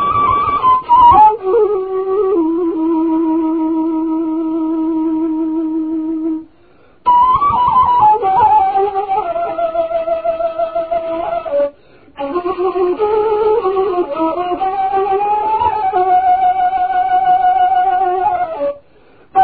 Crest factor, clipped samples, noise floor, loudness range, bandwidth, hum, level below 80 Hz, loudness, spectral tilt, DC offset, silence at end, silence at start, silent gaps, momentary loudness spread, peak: 14 dB; under 0.1%; -49 dBFS; 6 LU; 4.7 kHz; none; -44 dBFS; -14 LUFS; -11 dB/octave; 0.4%; 0 s; 0 s; none; 9 LU; 0 dBFS